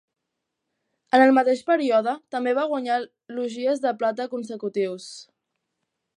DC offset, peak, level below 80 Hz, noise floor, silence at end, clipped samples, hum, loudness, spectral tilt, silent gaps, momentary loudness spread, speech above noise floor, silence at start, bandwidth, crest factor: under 0.1%; -6 dBFS; -82 dBFS; -82 dBFS; 0.95 s; under 0.1%; none; -23 LUFS; -4.5 dB/octave; none; 14 LU; 59 dB; 1.15 s; 11 kHz; 20 dB